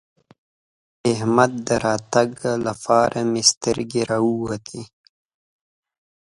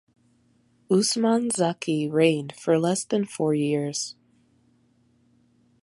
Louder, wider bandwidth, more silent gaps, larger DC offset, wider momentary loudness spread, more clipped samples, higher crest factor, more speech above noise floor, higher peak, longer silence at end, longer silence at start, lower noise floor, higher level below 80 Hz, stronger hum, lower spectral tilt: first, -20 LUFS vs -24 LUFS; about the same, 11.5 kHz vs 11.5 kHz; first, 3.57-3.61 s vs none; neither; about the same, 9 LU vs 7 LU; neither; about the same, 22 dB vs 20 dB; first, over 70 dB vs 40 dB; first, 0 dBFS vs -6 dBFS; second, 1.35 s vs 1.7 s; first, 1.05 s vs 0.9 s; first, under -90 dBFS vs -63 dBFS; first, -54 dBFS vs -72 dBFS; neither; about the same, -4 dB/octave vs -5 dB/octave